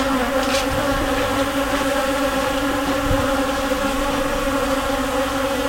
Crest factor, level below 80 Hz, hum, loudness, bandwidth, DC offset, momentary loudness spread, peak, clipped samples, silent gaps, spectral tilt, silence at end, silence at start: 14 dB; -32 dBFS; none; -20 LUFS; 16.5 kHz; under 0.1%; 2 LU; -6 dBFS; under 0.1%; none; -4 dB/octave; 0 s; 0 s